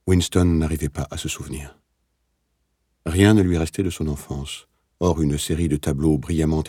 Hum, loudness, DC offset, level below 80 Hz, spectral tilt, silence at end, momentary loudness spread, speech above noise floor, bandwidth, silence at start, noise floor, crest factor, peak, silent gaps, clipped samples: none; -21 LUFS; under 0.1%; -38 dBFS; -6 dB/octave; 0 s; 16 LU; 50 dB; 17 kHz; 0.05 s; -71 dBFS; 18 dB; -4 dBFS; none; under 0.1%